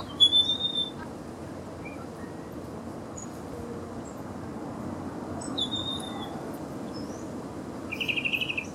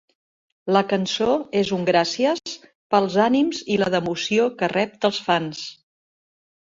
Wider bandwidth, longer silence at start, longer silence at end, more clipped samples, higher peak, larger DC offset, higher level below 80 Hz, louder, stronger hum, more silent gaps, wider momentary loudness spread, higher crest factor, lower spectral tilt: first, 16.5 kHz vs 7.8 kHz; second, 0 s vs 0.65 s; second, 0 s vs 0.9 s; neither; second, -10 dBFS vs -4 dBFS; neither; about the same, -58 dBFS vs -62 dBFS; second, -30 LUFS vs -21 LUFS; neither; second, none vs 2.75-2.90 s; first, 15 LU vs 11 LU; about the same, 22 dB vs 20 dB; second, -3.5 dB/octave vs -5 dB/octave